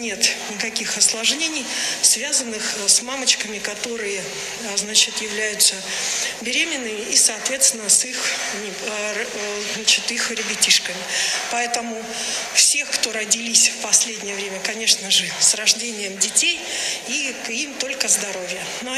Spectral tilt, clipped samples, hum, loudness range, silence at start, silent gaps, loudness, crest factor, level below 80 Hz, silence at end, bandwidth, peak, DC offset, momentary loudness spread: 1 dB/octave; under 0.1%; none; 3 LU; 0 s; none; -18 LUFS; 20 dB; -62 dBFS; 0 s; 14.5 kHz; 0 dBFS; under 0.1%; 11 LU